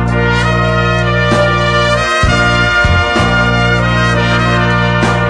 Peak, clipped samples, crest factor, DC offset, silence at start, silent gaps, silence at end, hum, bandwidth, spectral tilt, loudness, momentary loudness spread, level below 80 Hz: 0 dBFS; under 0.1%; 10 dB; 0.2%; 0 s; none; 0 s; 60 Hz at -35 dBFS; 10.5 kHz; -5.5 dB/octave; -11 LUFS; 2 LU; -22 dBFS